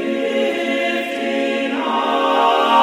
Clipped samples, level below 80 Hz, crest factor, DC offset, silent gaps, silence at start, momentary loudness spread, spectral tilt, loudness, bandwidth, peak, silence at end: under 0.1%; -68 dBFS; 14 dB; under 0.1%; none; 0 s; 5 LU; -3.5 dB/octave; -18 LUFS; 15.5 kHz; -2 dBFS; 0 s